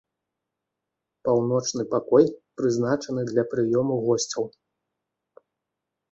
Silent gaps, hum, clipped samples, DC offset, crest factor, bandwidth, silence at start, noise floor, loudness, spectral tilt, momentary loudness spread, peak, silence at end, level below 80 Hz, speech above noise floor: none; none; under 0.1%; under 0.1%; 20 dB; 8 kHz; 1.25 s; -84 dBFS; -24 LUFS; -5.5 dB/octave; 8 LU; -4 dBFS; 1.65 s; -66 dBFS; 61 dB